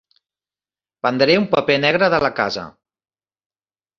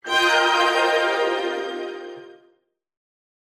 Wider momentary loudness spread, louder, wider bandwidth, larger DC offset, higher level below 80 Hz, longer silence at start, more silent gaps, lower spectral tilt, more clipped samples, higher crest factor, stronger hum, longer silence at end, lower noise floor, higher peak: second, 9 LU vs 16 LU; first, -17 LUFS vs -20 LUFS; second, 7.4 kHz vs 15 kHz; neither; first, -56 dBFS vs under -90 dBFS; first, 1.05 s vs 0.05 s; neither; first, -5.5 dB/octave vs -0.5 dB/octave; neither; about the same, 20 dB vs 16 dB; first, 50 Hz at -50 dBFS vs none; first, 1.3 s vs 1.15 s; first, under -90 dBFS vs -65 dBFS; first, 0 dBFS vs -6 dBFS